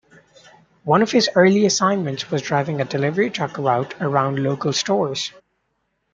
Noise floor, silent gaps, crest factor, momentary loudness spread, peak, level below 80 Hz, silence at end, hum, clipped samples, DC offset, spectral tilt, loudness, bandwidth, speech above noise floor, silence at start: -71 dBFS; none; 18 dB; 9 LU; -2 dBFS; -64 dBFS; 0.85 s; none; under 0.1%; under 0.1%; -4.5 dB/octave; -19 LUFS; 9.2 kHz; 52 dB; 0.85 s